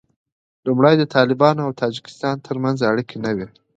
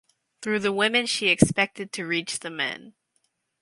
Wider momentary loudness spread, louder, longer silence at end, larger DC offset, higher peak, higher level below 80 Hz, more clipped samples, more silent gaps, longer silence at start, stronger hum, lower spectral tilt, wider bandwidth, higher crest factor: about the same, 10 LU vs 12 LU; first, -19 LUFS vs -24 LUFS; second, 0.3 s vs 0.7 s; neither; about the same, 0 dBFS vs 0 dBFS; about the same, -60 dBFS vs -56 dBFS; neither; neither; first, 0.65 s vs 0.4 s; neither; first, -7 dB/octave vs -3.5 dB/octave; second, 8.8 kHz vs 11.5 kHz; second, 18 dB vs 26 dB